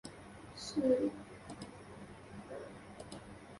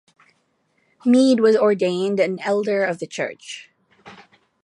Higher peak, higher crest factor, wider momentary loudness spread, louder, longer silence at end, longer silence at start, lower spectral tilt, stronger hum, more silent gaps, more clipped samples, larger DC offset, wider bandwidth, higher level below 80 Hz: second, -20 dBFS vs -6 dBFS; about the same, 20 dB vs 16 dB; first, 20 LU vs 14 LU; second, -39 LUFS vs -19 LUFS; second, 0 s vs 0.5 s; second, 0.05 s vs 1.05 s; about the same, -5.5 dB/octave vs -5.5 dB/octave; neither; neither; neither; neither; about the same, 11.5 kHz vs 10.5 kHz; first, -66 dBFS vs -74 dBFS